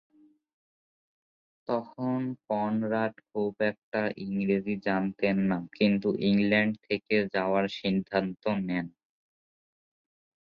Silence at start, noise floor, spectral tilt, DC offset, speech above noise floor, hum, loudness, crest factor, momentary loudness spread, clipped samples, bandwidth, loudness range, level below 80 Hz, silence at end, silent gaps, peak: 1.7 s; under -90 dBFS; -8.5 dB/octave; under 0.1%; over 62 dB; none; -29 LUFS; 20 dB; 7 LU; under 0.1%; 5.6 kHz; 5 LU; -66 dBFS; 1.55 s; 3.83-3.92 s; -10 dBFS